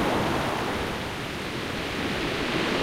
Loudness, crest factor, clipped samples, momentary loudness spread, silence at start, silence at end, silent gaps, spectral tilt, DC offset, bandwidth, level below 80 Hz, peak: -28 LUFS; 16 dB; under 0.1%; 6 LU; 0 s; 0 s; none; -4.5 dB/octave; under 0.1%; 16 kHz; -44 dBFS; -12 dBFS